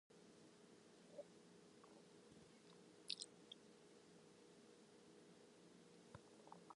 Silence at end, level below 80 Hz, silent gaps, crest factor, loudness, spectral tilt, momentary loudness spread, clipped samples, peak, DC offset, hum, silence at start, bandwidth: 0 s; under -90 dBFS; none; 38 dB; -62 LUFS; -3 dB/octave; 14 LU; under 0.1%; -26 dBFS; under 0.1%; none; 0.1 s; 11 kHz